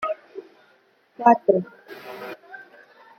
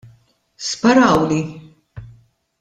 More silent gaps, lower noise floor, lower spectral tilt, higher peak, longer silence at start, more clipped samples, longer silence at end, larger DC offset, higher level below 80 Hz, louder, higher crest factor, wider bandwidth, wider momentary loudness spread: neither; first, -60 dBFS vs -54 dBFS; first, -7.5 dB/octave vs -5 dB/octave; about the same, -2 dBFS vs -2 dBFS; second, 0 s vs 0.6 s; neither; about the same, 0.55 s vs 0.55 s; neither; second, -76 dBFS vs -48 dBFS; second, -21 LUFS vs -16 LUFS; about the same, 22 dB vs 18 dB; first, 15.5 kHz vs 10 kHz; first, 25 LU vs 15 LU